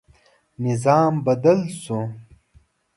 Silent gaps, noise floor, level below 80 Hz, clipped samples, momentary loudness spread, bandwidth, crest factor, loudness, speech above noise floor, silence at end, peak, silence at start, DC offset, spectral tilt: none; -57 dBFS; -58 dBFS; under 0.1%; 11 LU; 11.5 kHz; 18 dB; -20 LUFS; 38 dB; 0.75 s; -4 dBFS; 0.6 s; under 0.1%; -7.5 dB/octave